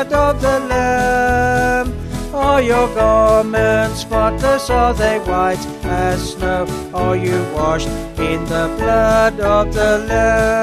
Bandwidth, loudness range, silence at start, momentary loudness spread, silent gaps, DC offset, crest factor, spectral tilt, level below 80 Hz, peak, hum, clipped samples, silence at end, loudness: 14 kHz; 4 LU; 0 s; 7 LU; none; under 0.1%; 14 dB; -5.5 dB/octave; -26 dBFS; -2 dBFS; none; under 0.1%; 0 s; -16 LUFS